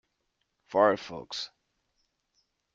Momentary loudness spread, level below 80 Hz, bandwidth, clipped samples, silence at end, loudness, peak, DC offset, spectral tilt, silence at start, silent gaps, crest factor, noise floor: 13 LU; -72 dBFS; 7.6 kHz; under 0.1%; 1.3 s; -29 LUFS; -8 dBFS; under 0.1%; -4.5 dB/octave; 0.7 s; none; 24 dB; -79 dBFS